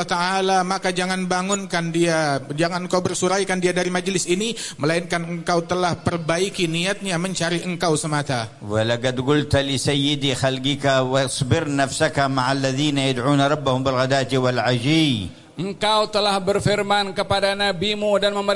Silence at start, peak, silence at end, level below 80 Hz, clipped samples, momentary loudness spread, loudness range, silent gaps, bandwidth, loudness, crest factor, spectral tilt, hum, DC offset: 0 s; -6 dBFS; 0 s; -50 dBFS; under 0.1%; 4 LU; 2 LU; none; 11.5 kHz; -21 LUFS; 16 dB; -4.5 dB/octave; none; under 0.1%